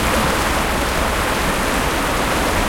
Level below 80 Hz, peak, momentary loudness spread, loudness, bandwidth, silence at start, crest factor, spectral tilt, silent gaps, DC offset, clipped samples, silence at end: -26 dBFS; -6 dBFS; 2 LU; -18 LUFS; 16.5 kHz; 0 s; 12 dB; -3.5 dB/octave; none; under 0.1%; under 0.1%; 0 s